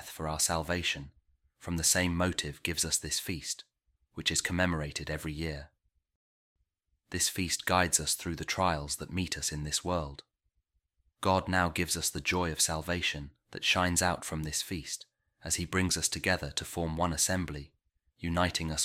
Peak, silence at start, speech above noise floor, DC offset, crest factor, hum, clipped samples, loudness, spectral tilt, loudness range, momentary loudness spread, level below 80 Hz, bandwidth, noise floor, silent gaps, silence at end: -12 dBFS; 0 s; 47 dB; under 0.1%; 22 dB; none; under 0.1%; -31 LUFS; -3 dB/octave; 4 LU; 11 LU; -50 dBFS; 16.5 kHz; -79 dBFS; 6.15-6.56 s; 0 s